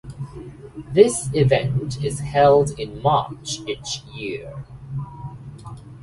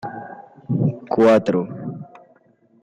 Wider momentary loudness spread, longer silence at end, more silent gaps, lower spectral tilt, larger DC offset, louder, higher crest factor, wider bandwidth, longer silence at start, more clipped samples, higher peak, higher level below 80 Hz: about the same, 22 LU vs 23 LU; second, 0 s vs 0.75 s; neither; second, -5.5 dB/octave vs -8.5 dB/octave; neither; about the same, -20 LUFS vs -19 LUFS; first, 22 dB vs 14 dB; first, 11.5 kHz vs 9.8 kHz; about the same, 0.05 s vs 0.05 s; neither; first, 0 dBFS vs -6 dBFS; first, -46 dBFS vs -60 dBFS